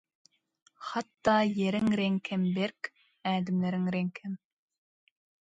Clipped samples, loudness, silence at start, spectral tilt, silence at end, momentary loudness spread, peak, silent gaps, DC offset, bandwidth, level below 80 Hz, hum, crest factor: under 0.1%; -30 LUFS; 0.8 s; -7 dB/octave; 1.25 s; 15 LU; -12 dBFS; none; under 0.1%; 7.8 kHz; -68 dBFS; none; 20 dB